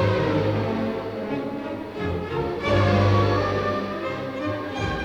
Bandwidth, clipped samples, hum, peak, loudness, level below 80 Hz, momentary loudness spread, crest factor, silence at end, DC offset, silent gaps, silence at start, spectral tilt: 7.8 kHz; under 0.1%; none; -8 dBFS; -24 LUFS; -44 dBFS; 10 LU; 16 dB; 0 s; under 0.1%; none; 0 s; -7.5 dB/octave